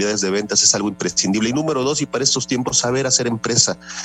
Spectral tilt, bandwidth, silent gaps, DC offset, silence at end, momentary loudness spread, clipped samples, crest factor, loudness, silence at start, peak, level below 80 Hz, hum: -2.5 dB/octave; 12.5 kHz; none; under 0.1%; 0 s; 6 LU; under 0.1%; 18 dB; -17 LUFS; 0 s; 0 dBFS; -54 dBFS; none